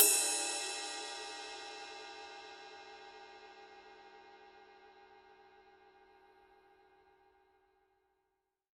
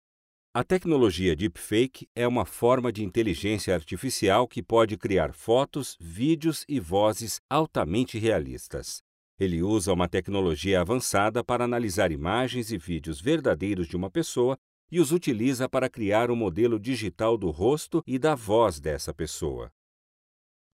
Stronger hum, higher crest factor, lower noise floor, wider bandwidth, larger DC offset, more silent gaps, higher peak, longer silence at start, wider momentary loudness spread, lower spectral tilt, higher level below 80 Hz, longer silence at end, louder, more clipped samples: neither; first, 32 dB vs 16 dB; second, -85 dBFS vs under -90 dBFS; second, 13 kHz vs 16 kHz; neither; second, none vs 2.07-2.15 s, 7.39-7.49 s, 9.01-9.38 s, 14.58-14.88 s; about the same, -10 dBFS vs -10 dBFS; second, 0 s vs 0.55 s; first, 26 LU vs 8 LU; second, 2 dB/octave vs -5.5 dB/octave; second, -82 dBFS vs -48 dBFS; first, 3.15 s vs 1.05 s; second, -36 LUFS vs -26 LUFS; neither